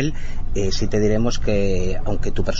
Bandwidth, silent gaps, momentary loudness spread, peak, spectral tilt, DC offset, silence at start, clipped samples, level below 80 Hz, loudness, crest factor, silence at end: 7.4 kHz; none; 6 LU; -6 dBFS; -6 dB/octave; under 0.1%; 0 s; under 0.1%; -22 dBFS; -23 LUFS; 10 dB; 0 s